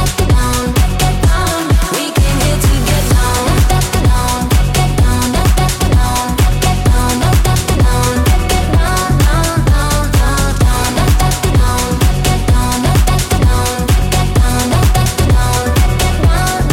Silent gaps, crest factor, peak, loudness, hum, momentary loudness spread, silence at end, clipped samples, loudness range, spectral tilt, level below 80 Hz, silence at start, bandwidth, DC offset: none; 10 dB; -2 dBFS; -12 LUFS; none; 1 LU; 0 s; under 0.1%; 0 LU; -5 dB/octave; -14 dBFS; 0 s; 17 kHz; under 0.1%